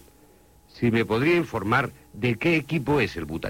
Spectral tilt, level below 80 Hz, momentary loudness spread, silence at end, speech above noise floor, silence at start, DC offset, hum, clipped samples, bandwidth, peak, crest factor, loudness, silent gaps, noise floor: -7 dB/octave; -50 dBFS; 6 LU; 0 s; 31 dB; 0.75 s; under 0.1%; none; under 0.1%; 16.5 kHz; -8 dBFS; 18 dB; -24 LUFS; none; -55 dBFS